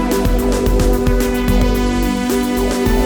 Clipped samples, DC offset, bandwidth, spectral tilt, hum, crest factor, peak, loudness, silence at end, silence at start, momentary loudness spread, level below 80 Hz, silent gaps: under 0.1%; under 0.1%; over 20 kHz; -5.5 dB/octave; none; 12 dB; -2 dBFS; -16 LUFS; 0 s; 0 s; 2 LU; -18 dBFS; none